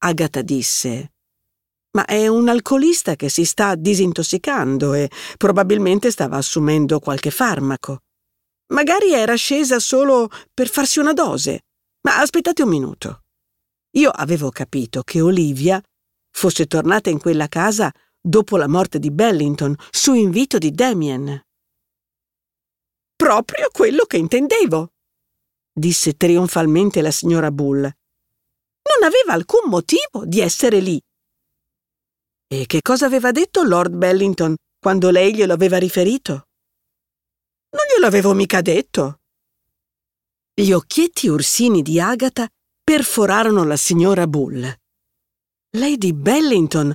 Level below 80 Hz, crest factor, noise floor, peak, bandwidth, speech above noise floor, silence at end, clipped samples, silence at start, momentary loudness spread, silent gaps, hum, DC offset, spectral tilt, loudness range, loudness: -58 dBFS; 16 dB; -87 dBFS; -2 dBFS; 17 kHz; 71 dB; 0 s; under 0.1%; 0 s; 9 LU; none; none; under 0.1%; -4.5 dB/octave; 3 LU; -16 LUFS